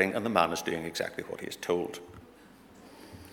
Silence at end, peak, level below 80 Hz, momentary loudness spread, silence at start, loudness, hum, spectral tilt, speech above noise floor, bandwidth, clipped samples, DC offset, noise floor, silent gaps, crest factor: 0 s; -6 dBFS; -64 dBFS; 24 LU; 0 s; -31 LUFS; none; -4 dB/octave; 24 dB; 19.5 kHz; under 0.1%; under 0.1%; -55 dBFS; none; 26 dB